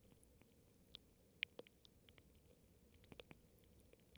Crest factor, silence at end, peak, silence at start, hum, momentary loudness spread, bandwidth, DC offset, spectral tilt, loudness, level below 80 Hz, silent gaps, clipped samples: 40 dB; 0 s; -22 dBFS; 0 s; none; 19 LU; over 20 kHz; under 0.1%; -3 dB/octave; -55 LUFS; -76 dBFS; none; under 0.1%